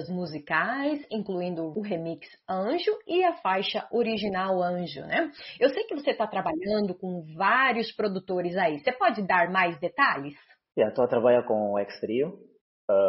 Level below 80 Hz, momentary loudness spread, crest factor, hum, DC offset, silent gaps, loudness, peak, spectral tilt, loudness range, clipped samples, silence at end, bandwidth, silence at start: -68 dBFS; 11 LU; 18 dB; none; under 0.1%; 12.61-12.88 s; -27 LUFS; -10 dBFS; -3 dB/octave; 4 LU; under 0.1%; 0 s; 5.8 kHz; 0 s